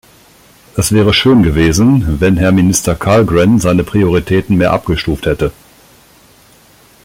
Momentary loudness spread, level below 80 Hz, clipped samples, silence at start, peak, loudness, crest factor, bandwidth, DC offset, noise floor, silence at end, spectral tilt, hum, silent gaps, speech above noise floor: 7 LU; -30 dBFS; under 0.1%; 0.75 s; 0 dBFS; -11 LUFS; 12 dB; 16.5 kHz; under 0.1%; -44 dBFS; 1.55 s; -5.5 dB/octave; none; none; 34 dB